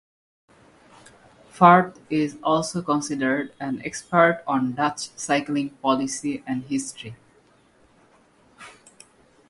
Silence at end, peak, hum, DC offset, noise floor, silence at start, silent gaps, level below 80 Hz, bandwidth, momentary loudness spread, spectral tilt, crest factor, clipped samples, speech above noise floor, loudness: 0.8 s; 0 dBFS; none; under 0.1%; -58 dBFS; 1.55 s; none; -64 dBFS; 11.5 kHz; 13 LU; -5 dB/octave; 24 dB; under 0.1%; 36 dB; -23 LUFS